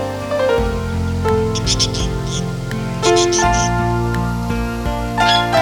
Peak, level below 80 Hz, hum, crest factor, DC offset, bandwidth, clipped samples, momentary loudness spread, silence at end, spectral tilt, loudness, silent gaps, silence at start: -2 dBFS; -28 dBFS; none; 16 dB; under 0.1%; 18 kHz; under 0.1%; 8 LU; 0 s; -4.5 dB/octave; -17 LUFS; none; 0 s